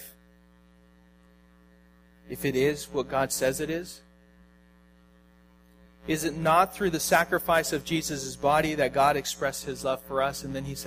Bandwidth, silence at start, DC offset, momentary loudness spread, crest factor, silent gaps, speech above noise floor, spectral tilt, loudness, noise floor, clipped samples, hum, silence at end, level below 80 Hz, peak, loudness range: 15.5 kHz; 0 s; under 0.1%; 11 LU; 22 dB; none; 31 dB; -4 dB/octave; -27 LUFS; -58 dBFS; under 0.1%; 60 Hz at -50 dBFS; 0 s; -54 dBFS; -6 dBFS; 8 LU